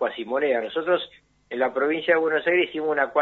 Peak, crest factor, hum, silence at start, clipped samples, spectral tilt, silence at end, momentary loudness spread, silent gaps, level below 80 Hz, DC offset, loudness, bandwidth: -8 dBFS; 16 dB; none; 0 s; under 0.1%; -6.5 dB/octave; 0 s; 5 LU; none; -68 dBFS; under 0.1%; -23 LUFS; 4.3 kHz